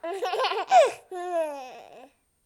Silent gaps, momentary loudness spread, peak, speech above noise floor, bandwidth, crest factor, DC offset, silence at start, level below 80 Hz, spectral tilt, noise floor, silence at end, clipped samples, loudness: none; 18 LU; -8 dBFS; 28 dB; 15 kHz; 18 dB; under 0.1%; 0.05 s; -76 dBFS; -1 dB/octave; -53 dBFS; 0.45 s; under 0.1%; -24 LUFS